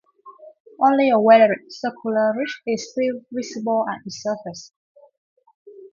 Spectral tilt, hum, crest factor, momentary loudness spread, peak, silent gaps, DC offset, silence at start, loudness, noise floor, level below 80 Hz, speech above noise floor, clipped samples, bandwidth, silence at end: -5 dB/octave; none; 20 dB; 16 LU; -2 dBFS; 0.60-0.65 s, 4.76-4.95 s, 5.17-5.36 s, 5.54-5.65 s; under 0.1%; 0.25 s; -20 LUFS; -45 dBFS; -70 dBFS; 26 dB; under 0.1%; 7.4 kHz; 0.05 s